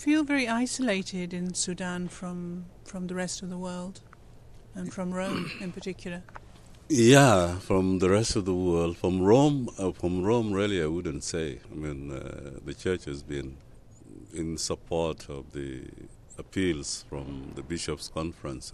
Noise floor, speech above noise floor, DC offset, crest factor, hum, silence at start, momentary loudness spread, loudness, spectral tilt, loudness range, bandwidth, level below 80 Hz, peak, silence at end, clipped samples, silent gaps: -50 dBFS; 22 dB; under 0.1%; 24 dB; none; 0 s; 17 LU; -28 LUFS; -5 dB/octave; 13 LU; 13 kHz; -48 dBFS; -4 dBFS; 0 s; under 0.1%; none